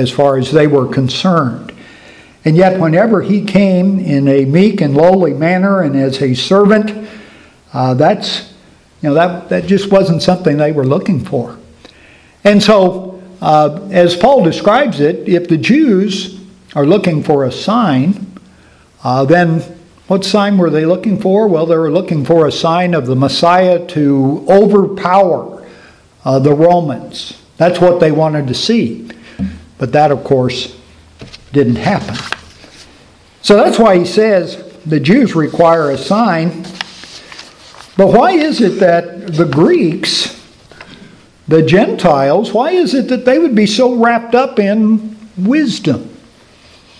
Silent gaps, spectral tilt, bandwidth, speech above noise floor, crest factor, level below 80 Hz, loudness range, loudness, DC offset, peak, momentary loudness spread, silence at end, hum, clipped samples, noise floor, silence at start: none; -6.5 dB/octave; 11 kHz; 34 dB; 12 dB; -46 dBFS; 3 LU; -11 LUFS; under 0.1%; 0 dBFS; 13 LU; 0.85 s; none; 0.3%; -44 dBFS; 0 s